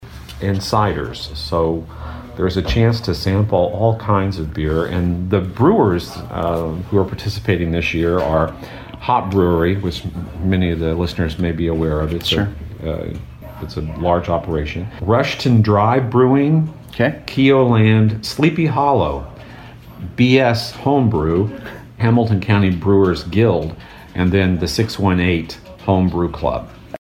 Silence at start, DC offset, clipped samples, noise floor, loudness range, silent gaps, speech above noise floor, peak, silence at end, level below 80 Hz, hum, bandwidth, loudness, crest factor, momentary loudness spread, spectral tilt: 0 s; under 0.1%; under 0.1%; -37 dBFS; 5 LU; none; 20 dB; -2 dBFS; 0.05 s; -34 dBFS; none; 16 kHz; -17 LUFS; 14 dB; 14 LU; -7 dB/octave